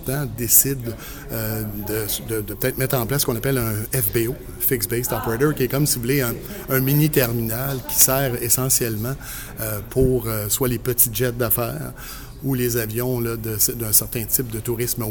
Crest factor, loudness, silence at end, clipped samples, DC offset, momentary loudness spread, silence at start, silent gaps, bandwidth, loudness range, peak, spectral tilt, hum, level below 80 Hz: 22 dB; -20 LUFS; 0 s; under 0.1%; under 0.1%; 12 LU; 0 s; none; 19.5 kHz; 3 LU; 0 dBFS; -4 dB/octave; none; -38 dBFS